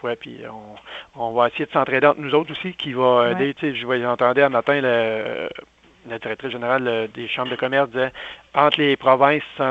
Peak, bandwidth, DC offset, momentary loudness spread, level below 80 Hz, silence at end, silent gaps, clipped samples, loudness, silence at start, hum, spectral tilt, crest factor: 0 dBFS; 7.6 kHz; under 0.1%; 18 LU; -62 dBFS; 0 s; none; under 0.1%; -20 LUFS; 0.05 s; none; -7 dB/octave; 20 dB